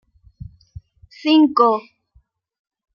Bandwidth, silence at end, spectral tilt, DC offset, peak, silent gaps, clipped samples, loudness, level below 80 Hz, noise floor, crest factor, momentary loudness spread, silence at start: 6.6 kHz; 1.15 s; -6.5 dB/octave; under 0.1%; -2 dBFS; none; under 0.1%; -16 LUFS; -52 dBFS; -58 dBFS; 18 dB; 14 LU; 1.25 s